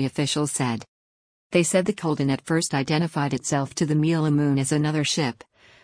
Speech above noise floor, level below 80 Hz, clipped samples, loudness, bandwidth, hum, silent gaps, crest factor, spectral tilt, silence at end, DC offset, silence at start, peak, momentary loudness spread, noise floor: over 67 dB; -60 dBFS; under 0.1%; -23 LUFS; 10.5 kHz; none; 0.88-1.50 s; 16 dB; -5 dB/octave; 0.5 s; under 0.1%; 0 s; -6 dBFS; 4 LU; under -90 dBFS